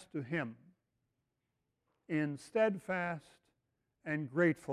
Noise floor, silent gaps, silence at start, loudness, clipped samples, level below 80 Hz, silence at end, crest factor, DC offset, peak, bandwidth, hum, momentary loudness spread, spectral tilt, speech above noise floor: -85 dBFS; none; 0 s; -36 LUFS; under 0.1%; -78 dBFS; 0 s; 20 dB; under 0.1%; -18 dBFS; 12.5 kHz; none; 11 LU; -7.5 dB/octave; 50 dB